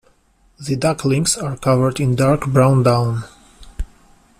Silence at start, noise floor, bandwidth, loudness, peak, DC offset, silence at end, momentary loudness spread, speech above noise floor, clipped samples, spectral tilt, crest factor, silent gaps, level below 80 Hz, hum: 0.6 s; -56 dBFS; 14.5 kHz; -17 LUFS; -2 dBFS; under 0.1%; 0.55 s; 20 LU; 40 dB; under 0.1%; -6 dB/octave; 16 dB; none; -38 dBFS; none